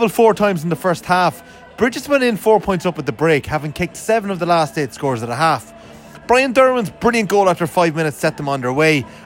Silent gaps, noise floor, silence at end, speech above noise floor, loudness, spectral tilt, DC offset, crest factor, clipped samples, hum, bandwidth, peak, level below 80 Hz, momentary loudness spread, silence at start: none; -39 dBFS; 0 s; 22 dB; -17 LUFS; -5.5 dB/octave; under 0.1%; 16 dB; under 0.1%; none; 16.5 kHz; 0 dBFS; -46 dBFS; 8 LU; 0 s